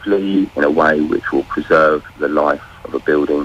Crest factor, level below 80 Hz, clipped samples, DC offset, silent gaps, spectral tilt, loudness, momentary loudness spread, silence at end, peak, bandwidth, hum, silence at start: 12 dB; -46 dBFS; under 0.1%; under 0.1%; none; -7 dB/octave; -16 LUFS; 7 LU; 0 s; -2 dBFS; 8.6 kHz; none; 0 s